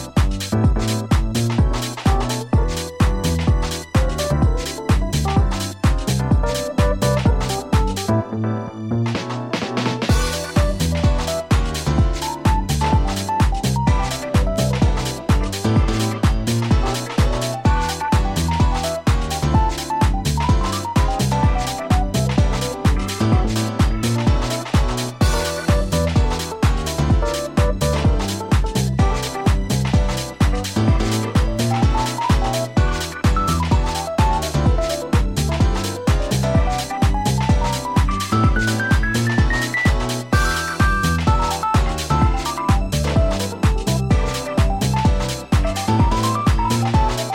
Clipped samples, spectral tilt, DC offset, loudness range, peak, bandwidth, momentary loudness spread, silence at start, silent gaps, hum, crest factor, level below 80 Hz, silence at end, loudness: under 0.1%; -5.5 dB/octave; under 0.1%; 2 LU; -4 dBFS; 17 kHz; 3 LU; 0 s; none; none; 14 dB; -22 dBFS; 0 s; -19 LUFS